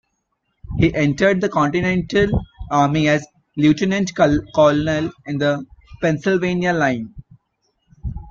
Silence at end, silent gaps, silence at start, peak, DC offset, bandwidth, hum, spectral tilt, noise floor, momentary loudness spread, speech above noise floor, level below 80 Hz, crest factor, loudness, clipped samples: 0 s; none; 0.65 s; -2 dBFS; under 0.1%; 7.6 kHz; none; -6.5 dB/octave; -71 dBFS; 11 LU; 54 dB; -38 dBFS; 18 dB; -18 LUFS; under 0.1%